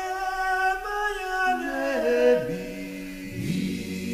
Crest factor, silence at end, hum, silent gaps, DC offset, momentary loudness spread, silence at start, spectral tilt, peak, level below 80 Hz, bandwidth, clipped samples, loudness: 18 dB; 0 s; none; none; under 0.1%; 13 LU; 0 s; -5 dB/octave; -8 dBFS; -48 dBFS; 15.5 kHz; under 0.1%; -26 LUFS